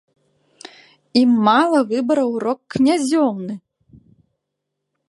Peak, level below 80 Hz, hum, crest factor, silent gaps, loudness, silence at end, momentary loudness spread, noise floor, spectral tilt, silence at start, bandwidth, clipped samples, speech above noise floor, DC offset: -2 dBFS; -62 dBFS; none; 18 dB; none; -17 LUFS; 1.5 s; 11 LU; -78 dBFS; -5 dB/octave; 1.15 s; 11.5 kHz; under 0.1%; 62 dB; under 0.1%